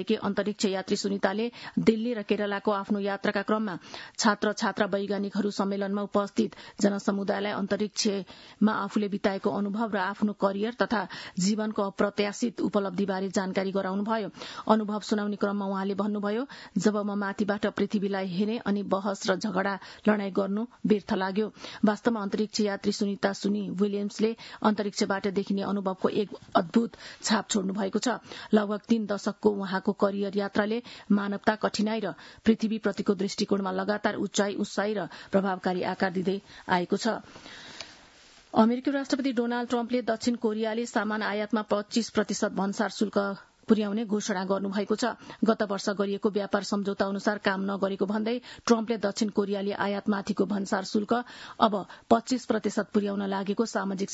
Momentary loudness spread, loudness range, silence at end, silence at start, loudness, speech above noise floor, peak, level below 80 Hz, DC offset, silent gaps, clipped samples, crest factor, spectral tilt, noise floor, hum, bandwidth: 4 LU; 1 LU; 0 s; 0 s; -28 LUFS; 27 dB; -6 dBFS; -68 dBFS; under 0.1%; none; under 0.1%; 22 dB; -5 dB/octave; -55 dBFS; none; 8 kHz